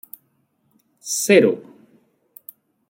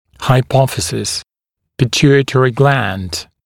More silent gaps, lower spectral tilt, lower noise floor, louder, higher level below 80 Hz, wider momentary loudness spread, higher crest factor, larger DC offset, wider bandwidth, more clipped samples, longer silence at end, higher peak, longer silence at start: neither; second, -3.5 dB/octave vs -5 dB/octave; second, -66 dBFS vs -77 dBFS; second, -17 LUFS vs -14 LUFS; second, -70 dBFS vs -42 dBFS; first, 27 LU vs 10 LU; first, 20 dB vs 14 dB; neither; about the same, 17 kHz vs 16.5 kHz; neither; first, 1.3 s vs 0.2 s; about the same, -2 dBFS vs 0 dBFS; first, 1.05 s vs 0.2 s